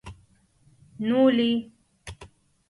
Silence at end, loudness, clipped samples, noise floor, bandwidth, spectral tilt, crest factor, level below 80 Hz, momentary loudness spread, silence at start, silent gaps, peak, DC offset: 0.45 s; -23 LUFS; under 0.1%; -61 dBFS; 11.5 kHz; -6 dB/octave; 18 dB; -56 dBFS; 25 LU; 0.05 s; none; -10 dBFS; under 0.1%